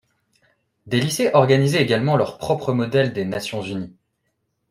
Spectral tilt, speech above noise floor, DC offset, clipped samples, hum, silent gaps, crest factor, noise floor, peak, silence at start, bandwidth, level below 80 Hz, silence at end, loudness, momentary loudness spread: -5.5 dB/octave; 53 dB; under 0.1%; under 0.1%; none; none; 20 dB; -73 dBFS; -2 dBFS; 0.85 s; 15.5 kHz; -58 dBFS; 0.8 s; -20 LUFS; 12 LU